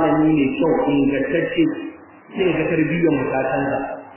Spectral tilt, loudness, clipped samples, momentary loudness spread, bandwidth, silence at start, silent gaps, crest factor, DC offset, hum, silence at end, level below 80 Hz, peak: -11 dB/octave; -19 LUFS; under 0.1%; 7 LU; 3.2 kHz; 0 s; none; 12 dB; under 0.1%; none; 0 s; -50 dBFS; -6 dBFS